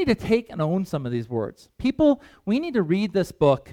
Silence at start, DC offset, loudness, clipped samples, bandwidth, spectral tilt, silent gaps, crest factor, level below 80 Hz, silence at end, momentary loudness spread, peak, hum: 0 s; under 0.1%; -24 LUFS; under 0.1%; 16 kHz; -7.5 dB/octave; none; 16 dB; -48 dBFS; 0 s; 7 LU; -6 dBFS; none